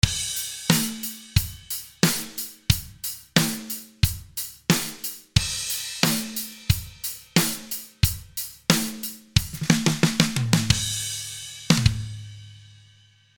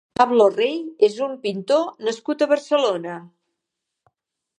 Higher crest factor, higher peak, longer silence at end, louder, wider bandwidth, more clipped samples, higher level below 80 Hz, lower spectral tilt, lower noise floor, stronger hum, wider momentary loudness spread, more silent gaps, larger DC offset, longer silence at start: about the same, 24 dB vs 20 dB; about the same, 0 dBFS vs -2 dBFS; second, 0.75 s vs 1.3 s; second, -24 LUFS vs -20 LUFS; first, 19.5 kHz vs 10.5 kHz; neither; first, -40 dBFS vs -70 dBFS; about the same, -3.5 dB/octave vs -4.5 dB/octave; second, -56 dBFS vs -82 dBFS; neither; about the same, 11 LU vs 11 LU; neither; neither; second, 0.05 s vs 0.2 s